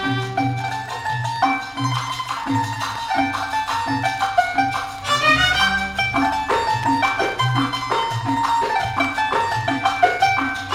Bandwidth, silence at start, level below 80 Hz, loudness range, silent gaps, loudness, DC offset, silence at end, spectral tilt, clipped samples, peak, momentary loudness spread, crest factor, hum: 16.5 kHz; 0 s; -44 dBFS; 4 LU; none; -20 LUFS; under 0.1%; 0 s; -4 dB/octave; under 0.1%; -2 dBFS; 7 LU; 18 dB; none